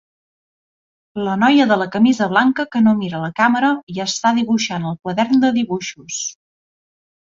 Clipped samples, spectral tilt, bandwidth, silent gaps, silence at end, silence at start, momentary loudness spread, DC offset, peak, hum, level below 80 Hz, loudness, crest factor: under 0.1%; -4.5 dB/octave; 7.8 kHz; 3.83-3.87 s; 1.05 s; 1.15 s; 11 LU; under 0.1%; -2 dBFS; none; -60 dBFS; -17 LUFS; 16 dB